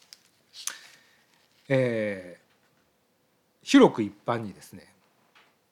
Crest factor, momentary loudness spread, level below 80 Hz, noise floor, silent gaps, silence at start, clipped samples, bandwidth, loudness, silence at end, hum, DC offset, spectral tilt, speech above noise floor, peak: 22 dB; 27 LU; -74 dBFS; -69 dBFS; none; 0.55 s; under 0.1%; 15 kHz; -25 LUFS; 0.9 s; none; under 0.1%; -5.5 dB/octave; 45 dB; -6 dBFS